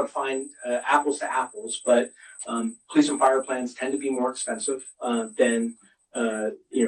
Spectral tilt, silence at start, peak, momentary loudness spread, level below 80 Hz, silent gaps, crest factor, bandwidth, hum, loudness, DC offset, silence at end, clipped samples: -3 dB/octave; 0 s; -6 dBFS; 9 LU; -74 dBFS; none; 18 dB; 10 kHz; none; -26 LUFS; under 0.1%; 0 s; under 0.1%